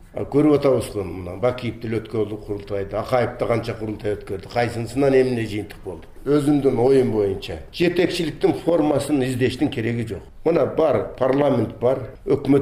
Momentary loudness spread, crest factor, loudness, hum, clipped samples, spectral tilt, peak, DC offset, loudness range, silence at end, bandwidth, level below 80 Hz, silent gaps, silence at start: 11 LU; 16 dB; -21 LUFS; none; under 0.1%; -7 dB/octave; -6 dBFS; under 0.1%; 5 LU; 0 s; 15.5 kHz; -44 dBFS; none; 0 s